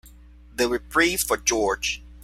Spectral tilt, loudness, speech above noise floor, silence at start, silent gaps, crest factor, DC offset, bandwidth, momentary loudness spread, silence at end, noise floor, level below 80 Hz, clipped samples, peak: -2 dB/octave; -23 LUFS; 24 dB; 0.05 s; none; 20 dB; under 0.1%; 16.5 kHz; 6 LU; 0 s; -47 dBFS; -44 dBFS; under 0.1%; -6 dBFS